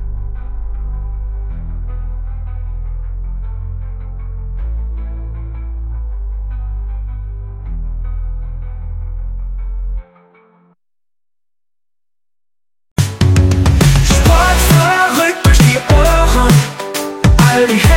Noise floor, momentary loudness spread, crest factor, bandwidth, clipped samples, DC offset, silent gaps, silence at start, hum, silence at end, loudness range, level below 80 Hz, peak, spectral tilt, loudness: under -90 dBFS; 17 LU; 14 dB; 17 kHz; under 0.1%; under 0.1%; 12.91-12.96 s; 0 s; none; 0 s; 18 LU; -18 dBFS; 0 dBFS; -5 dB/octave; -14 LUFS